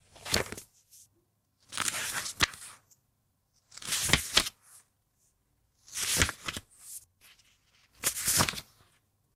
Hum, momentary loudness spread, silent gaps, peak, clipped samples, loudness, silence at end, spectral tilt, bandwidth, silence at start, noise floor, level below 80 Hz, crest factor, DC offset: none; 19 LU; none; -2 dBFS; under 0.1%; -29 LUFS; 0.75 s; -1 dB/octave; 17.5 kHz; 0.15 s; -75 dBFS; -52 dBFS; 32 dB; under 0.1%